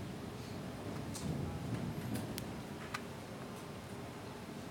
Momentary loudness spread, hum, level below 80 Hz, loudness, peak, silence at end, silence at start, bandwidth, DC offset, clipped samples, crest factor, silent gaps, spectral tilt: 6 LU; none; -60 dBFS; -44 LUFS; -20 dBFS; 0 s; 0 s; 17.5 kHz; under 0.1%; under 0.1%; 24 dB; none; -5.5 dB/octave